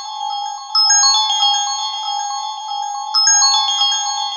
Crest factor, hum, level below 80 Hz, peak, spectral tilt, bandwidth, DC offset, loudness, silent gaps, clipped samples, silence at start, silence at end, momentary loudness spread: 14 dB; none; under -90 dBFS; -2 dBFS; 11.5 dB/octave; 7.6 kHz; under 0.1%; -14 LUFS; none; under 0.1%; 0 s; 0 s; 14 LU